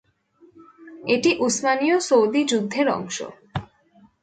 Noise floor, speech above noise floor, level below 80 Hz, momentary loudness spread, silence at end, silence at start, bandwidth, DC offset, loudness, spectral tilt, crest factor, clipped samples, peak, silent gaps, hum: -56 dBFS; 36 dB; -58 dBFS; 15 LU; 0.55 s; 0.8 s; 9.4 kHz; under 0.1%; -21 LUFS; -3.5 dB/octave; 16 dB; under 0.1%; -6 dBFS; none; none